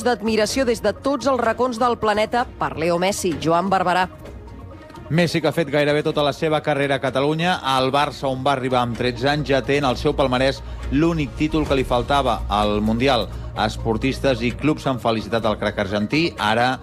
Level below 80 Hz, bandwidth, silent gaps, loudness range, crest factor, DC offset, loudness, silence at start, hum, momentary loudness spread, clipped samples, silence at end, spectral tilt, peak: -36 dBFS; 16 kHz; none; 1 LU; 14 dB; under 0.1%; -20 LUFS; 0 s; none; 4 LU; under 0.1%; 0 s; -5.5 dB/octave; -6 dBFS